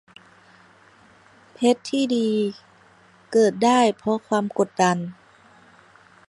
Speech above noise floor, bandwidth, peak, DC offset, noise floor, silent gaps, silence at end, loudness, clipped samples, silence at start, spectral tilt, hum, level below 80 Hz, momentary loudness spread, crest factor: 33 dB; 11.5 kHz; -4 dBFS; under 0.1%; -54 dBFS; none; 1.15 s; -21 LUFS; under 0.1%; 1.6 s; -5 dB/octave; none; -70 dBFS; 8 LU; 20 dB